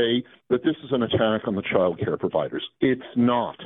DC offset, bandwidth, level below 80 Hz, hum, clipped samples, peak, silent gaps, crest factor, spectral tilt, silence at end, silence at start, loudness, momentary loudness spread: under 0.1%; 4 kHz; -58 dBFS; none; under 0.1%; -6 dBFS; none; 18 dB; -10.5 dB/octave; 0 s; 0 s; -24 LUFS; 5 LU